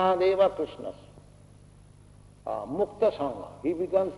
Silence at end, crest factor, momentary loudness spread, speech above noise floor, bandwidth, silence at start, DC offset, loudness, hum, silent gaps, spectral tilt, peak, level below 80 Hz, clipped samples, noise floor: 0 s; 18 dB; 17 LU; 26 dB; 11 kHz; 0 s; under 0.1%; -28 LUFS; 50 Hz at -55 dBFS; none; -7 dB/octave; -10 dBFS; -58 dBFS; under 0.1%; -53 dBFS